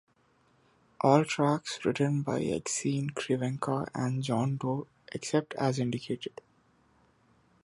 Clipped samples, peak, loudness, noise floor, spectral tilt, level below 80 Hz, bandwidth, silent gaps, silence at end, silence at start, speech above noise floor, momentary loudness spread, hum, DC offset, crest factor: under 0.1%; -8 dBFS; -30 LUFS; -68 dBFS; -5.5 dB/octave; -66 dBFS; 11.5 kHz; none; 1.35 s; 1.05 s; 38 dB; 11 LU; none; under 0.1%; 24 dB